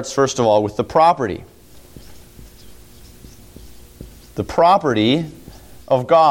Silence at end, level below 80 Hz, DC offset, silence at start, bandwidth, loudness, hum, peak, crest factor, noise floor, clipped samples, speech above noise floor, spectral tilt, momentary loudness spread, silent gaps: 0 s; -46 dBFS; under 0.1%; 0 s; 17 kHz; -16 LUFS; none; -2 dBFS; 16 dB; -43 dBFS; under 0.1%; 27 dB; -5 dB/octave; 15 LU; none